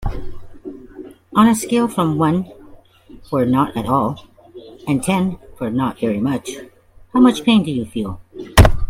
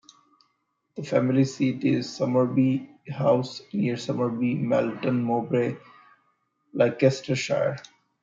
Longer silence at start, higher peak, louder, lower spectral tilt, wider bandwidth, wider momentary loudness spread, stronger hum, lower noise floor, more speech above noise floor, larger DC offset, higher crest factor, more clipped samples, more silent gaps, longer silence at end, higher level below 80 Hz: second, 0 s vs 0.95 s; first, 0 dBFS vs -6 dBFS; first, -18 LUFS vs -25 LUFS; about the same, -6 dB/octave vs -7 dB/octave; first, 16.5 kHz vs 7.8 kHz; first, 21 LU vs 9 LU; neither; second, -43 dBFS vs -74 dBFS; second, 26 dB vs 50 dB; neither; about the same, 18 dB vs 20 dB; neither; neither; second, 0 s vs 0.4 s; first, -28 dBFS vs -70 dBFS